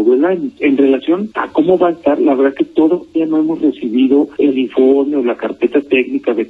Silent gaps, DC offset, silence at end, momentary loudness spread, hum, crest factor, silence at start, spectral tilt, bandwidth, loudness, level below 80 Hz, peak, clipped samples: none; under 0.1%; 0 s; 5 LU; none; 12 dB; 0 s; -8 dB/octave; 4.2 kHz; -14 LUFS; -56 dBFS; 0 dBFS; under 0.1%